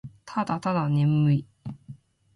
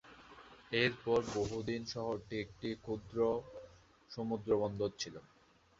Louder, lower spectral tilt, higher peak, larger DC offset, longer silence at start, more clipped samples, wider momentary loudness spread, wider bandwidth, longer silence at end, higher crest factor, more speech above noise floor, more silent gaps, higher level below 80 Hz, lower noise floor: first, -25 LUFS vs -38 LUFS; first, -8.5 dB/octave vs -4 dB/octave; about the same, -14 dBFS vs -16 dBFS; neither; about the same, 0.05 s vs 0.05 s; neither; about the same, 19 LU vs 21 LU; first, 11 kHz vs 7.8 kHz; second, 0.4 s vs 0.6 s; second, 12 dB vs 22 dB; about the same, 24 dB vs 23 dB; neither; about the same, -60 dBFS vs -64 dBFS; second, -48 dBFS vs -60 dBFS